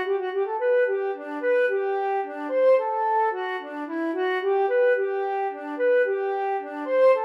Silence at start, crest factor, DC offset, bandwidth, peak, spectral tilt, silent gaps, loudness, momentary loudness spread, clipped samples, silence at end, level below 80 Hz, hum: 0 s; 14 dB; under 0.1%; 5.6 kHz; -10 dBFS; -3.5 dB/octave; none; -24 LUFS; 9 LU; under 0.1%; 0 s; under -90 dBFS; none